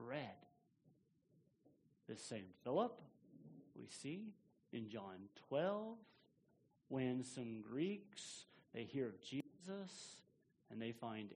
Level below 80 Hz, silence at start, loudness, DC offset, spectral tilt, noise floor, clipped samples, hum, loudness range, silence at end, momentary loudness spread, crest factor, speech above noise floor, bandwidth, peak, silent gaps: -88 dBFS; 0 s; -48 LUFS; under 0.1%; -5.5 dB/octave; -78 dBFS; under 0.1%; none; 3 LU; 0 s; 18 LU; 22 dB; 31 dB; 10 kHz; -26 dBFS; none